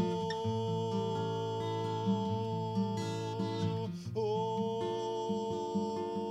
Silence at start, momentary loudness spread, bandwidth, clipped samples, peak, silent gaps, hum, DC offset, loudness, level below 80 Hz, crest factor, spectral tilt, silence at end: 0 s; 3 LU; 11.5 kHz; under 0.1%; -20 dBFS; none; none; under 0.1%; -35 LUFS; -70 dBFS; 14 dB; -7 dB/octave; 0 s